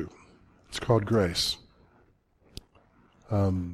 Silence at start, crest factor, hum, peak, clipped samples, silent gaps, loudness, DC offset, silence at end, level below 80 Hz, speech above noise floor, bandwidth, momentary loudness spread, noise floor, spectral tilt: 0 s; 22 dB; none; -8 dBFS; under 0.1%; none; -28 LUFS; under 0.1%; 0 s; -52 dBFS; 38 dB; 14.5 kHz; 24 LU; -64 dBFS; -5.5 dB/octave